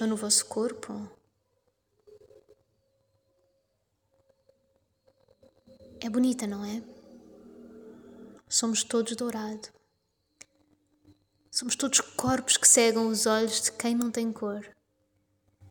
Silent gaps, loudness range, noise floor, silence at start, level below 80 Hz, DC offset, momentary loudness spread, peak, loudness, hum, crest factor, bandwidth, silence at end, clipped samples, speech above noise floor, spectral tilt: none; 11 LU; -76 dBFS; 0 s; -68 dBFS; under 0.1%; 19 LU; -6 dBFS; -26 LUFS; none; 26 dB; 19.5 kHz; 0 s; under 0.1%; 49 dB; -2 dB/octave